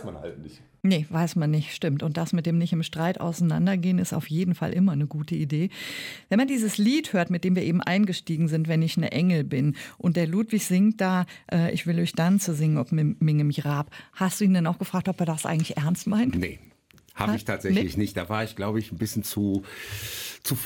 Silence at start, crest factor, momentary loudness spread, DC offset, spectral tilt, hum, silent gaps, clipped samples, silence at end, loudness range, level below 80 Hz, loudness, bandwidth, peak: 0 s; 14 dB; 7 LU; under 0.1%; -6 dB/octave; none; none; under 0.1%; 0 s; 3 LU; -56 dBFS; -25 LUFS; 17.5 kHz; -10 dBFS